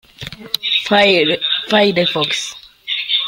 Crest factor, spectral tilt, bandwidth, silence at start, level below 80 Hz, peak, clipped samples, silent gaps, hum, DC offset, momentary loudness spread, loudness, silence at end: 16 dB; -3.5 dB/octave; 16.5 kHz; 0.2 s; -54 dBFS; 0 dBFS; under 0.1%; none; none; under 0.1%; 17 LU; -15 LUFS; 0 s